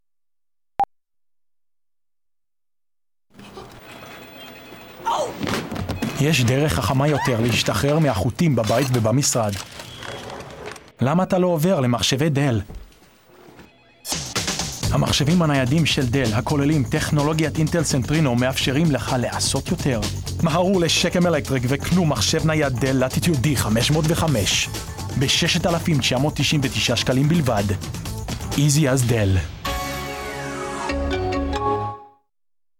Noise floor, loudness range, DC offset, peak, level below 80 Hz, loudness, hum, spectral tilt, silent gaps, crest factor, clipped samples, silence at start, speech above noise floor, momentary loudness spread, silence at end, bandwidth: under -90 dBFS; 6 LU; under 0.1%; -6 dBFS; -38 dBFS; -20 LUFS; none; -4.5 dB/octave; none; 16 dB; under 0.1%; 0.8 s; over 71 dB; 14 LU; 0.7 s; 18.5 kHz